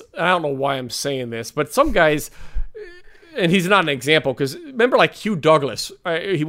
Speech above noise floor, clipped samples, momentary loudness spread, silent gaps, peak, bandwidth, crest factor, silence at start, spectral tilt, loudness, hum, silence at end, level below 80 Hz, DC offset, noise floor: 23 dB; under 0.1%; 17 LU; none; -2 dBFS; 16 kHz; 18 dB; 0 s; -4.5 dB/octave; -19 LUFS; none; 0 s; -36 dBFS; under 0.1%; -42 dBFS